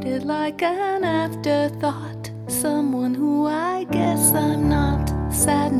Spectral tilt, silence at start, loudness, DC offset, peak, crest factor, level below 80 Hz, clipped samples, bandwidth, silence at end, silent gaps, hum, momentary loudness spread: -5 dB/octave; 0 s; -21 LUFS; under 0.1%; -4 dBFS; 16 dB; -34 dBFS; under 0.1%; 15.5 kHz; 0 s; none; none; 8 LU